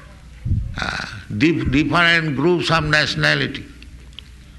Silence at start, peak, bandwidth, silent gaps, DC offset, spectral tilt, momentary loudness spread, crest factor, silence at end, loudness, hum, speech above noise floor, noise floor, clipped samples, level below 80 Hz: 0 s; -2 dBFS; 12 kHz; none; under 0.1%; -5 dB/octave; 13 LU; 16 dB; 0 s; -18 LUFS; none; 22 dB; -40 dBFS; under 0.1%; -34 dBFS